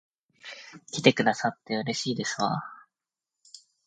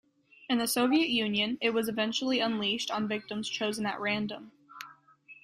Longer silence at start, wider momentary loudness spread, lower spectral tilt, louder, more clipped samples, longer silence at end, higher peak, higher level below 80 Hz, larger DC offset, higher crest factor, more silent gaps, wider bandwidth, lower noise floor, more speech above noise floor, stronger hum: about the same, 0.45 s vs 0.4 s; first, 22 LU vs 19 LU; about the same, -4 dB/octave vs -3.5 dB/octave; about the same, -27 LUFS vs -29 LUFS; neither; first, 0.3 s vs 0.1 s; first, -4 dBFS vs -14 dBFS; about the same, -72 dBFS vs -72 dBFS; neither; first, 26 dB vs 18 dB; neither; second, 9.6 kHz vs 15 kHz; first, -89 dBFS vs -56 dBFS; first, 62 dB vs 26 dB; neither